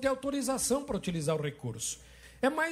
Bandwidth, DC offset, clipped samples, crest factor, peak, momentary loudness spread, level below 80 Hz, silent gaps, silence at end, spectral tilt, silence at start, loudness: 16 kHz; under 0.1%; under 0.1%; 16 dB; -16 dBFS; 7 LU; -58 dBFS; none; 0 s; -4 dB/octave; 0 s; -32 LUFS